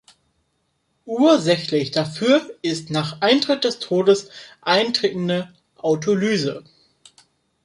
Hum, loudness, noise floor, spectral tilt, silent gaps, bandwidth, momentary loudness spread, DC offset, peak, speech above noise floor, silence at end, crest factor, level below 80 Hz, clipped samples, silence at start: none; -20 LUFS; -70 dBFS; -5 dB/octave; none; 11.5 kHz; 10 LU; under 0.1%; -2 dBFS; 50 dB; 1.05 s; 18 dB; -64 dBFS; under 0.1%; 1.05 s